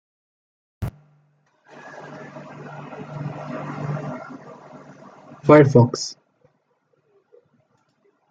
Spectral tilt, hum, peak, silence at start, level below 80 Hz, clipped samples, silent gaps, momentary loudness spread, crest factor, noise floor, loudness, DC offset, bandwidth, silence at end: -7 dB/octave; none; -2 dBFS; 0.8 s; -54 dBFS; under 0.1%; none; 28 LU; 22 dB; -67 dBFS; -20 LUFS; under 0.1%; 7.8 kHz; 2.15 s